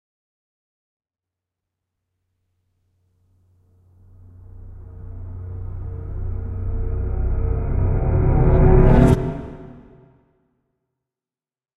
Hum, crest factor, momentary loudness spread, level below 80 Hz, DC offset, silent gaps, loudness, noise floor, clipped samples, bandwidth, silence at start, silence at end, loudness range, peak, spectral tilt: none; 20 dB; 25 LU; -26 dBFS; under 0.1%; none; -20 LUFS; under -90 dBFS; under 0.1%; 4.1 kHz; 4.55 s; 1.95 s; 19 LU; 0 dBFS; -10 dB/octave